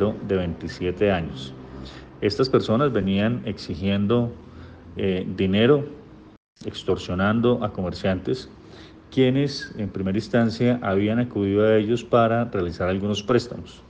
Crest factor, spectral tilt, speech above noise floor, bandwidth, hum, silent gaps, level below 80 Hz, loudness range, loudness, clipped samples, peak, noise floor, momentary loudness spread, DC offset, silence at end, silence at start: 18 dB; -7 dB/octave; 22 dB; 9 kHz; none; 6.37-6.56 s; -50 dBFS; 3 LU; -23 LUFS; under 0.1%; -4 dBFS; -45 dBFS; 16 LU; under 0.1%; 0.1 s; 0 s